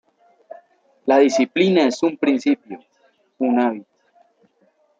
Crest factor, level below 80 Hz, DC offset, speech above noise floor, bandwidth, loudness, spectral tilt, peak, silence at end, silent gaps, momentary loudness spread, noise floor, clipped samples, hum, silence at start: 18 dB; -72 dBFS; under 0.1%; 44 dB; 7.8 kHz; -18 LUFS; -5.5 dB/octave; -2 dBFS; 1.2 s; none; 15 LU; -62 dBFS; under 0.1%; none; 1.05 s